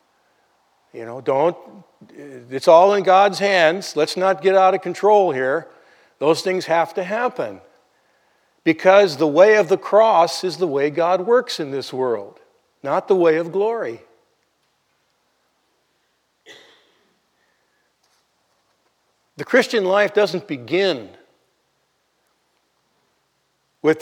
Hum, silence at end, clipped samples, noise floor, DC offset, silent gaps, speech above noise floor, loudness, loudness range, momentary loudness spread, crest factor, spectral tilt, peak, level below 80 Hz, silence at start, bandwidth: none; 0 s; under 0.1%; -68 dBFS; under 0.1%; none; 50 dB; -18 LUFS; 9 LU; 14 LU; 20 dB; -4.5 dB/octave; 0 dBFS; -82 dBFS; 0.95 s; 16 kHz